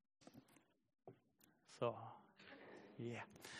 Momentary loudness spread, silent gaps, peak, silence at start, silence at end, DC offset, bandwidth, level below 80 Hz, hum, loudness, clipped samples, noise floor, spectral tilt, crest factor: 20 LU; none; -30 dBFS; 0.2 s; 0 s; under 0.1%; 13 kHz; under -90 dBFS; none; -51 LUFS; under 0.1%; -76 dBFS; -5.5 dB/octave; 24 dB